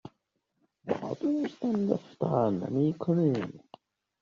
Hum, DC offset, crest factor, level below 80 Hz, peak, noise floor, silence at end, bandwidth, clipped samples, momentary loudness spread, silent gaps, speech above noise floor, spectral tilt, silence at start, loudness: none; under 0.1%; 18 dB; -70 dBFS; -12 dBFS; -79 dBFS; 0.65 s; 7.2 kHz; under 0.1%; 8 LU; none; 50 dB; -8.5 dB/octave; 0.05 s; -30 LUFS